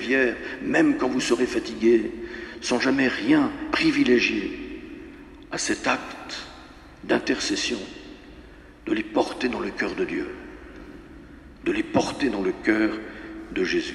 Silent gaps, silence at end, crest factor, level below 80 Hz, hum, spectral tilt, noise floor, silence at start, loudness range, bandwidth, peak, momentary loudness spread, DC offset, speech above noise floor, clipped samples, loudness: none; 0 s; 20 dB; -50 dBFS; none; -4 dB/octave; -46 dBFS; 0 s; 7 LU; 12 kHz; -6 dBFS; 21 LU; under 0.1%; 22 dB; under 0.1%; -24 LUFS